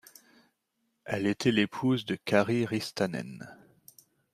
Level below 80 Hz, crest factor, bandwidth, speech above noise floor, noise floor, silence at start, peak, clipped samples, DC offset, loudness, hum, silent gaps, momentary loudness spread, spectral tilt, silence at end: -70 dBFS; 22 dB; 15 kHz; 50 dB; -78 dBFS; 1.05 s; -10 dBFS; under 0.1%; under 0.1%; -29 LUFS; none; none; 18 LU; -5.5 dB/octave; 0.8 s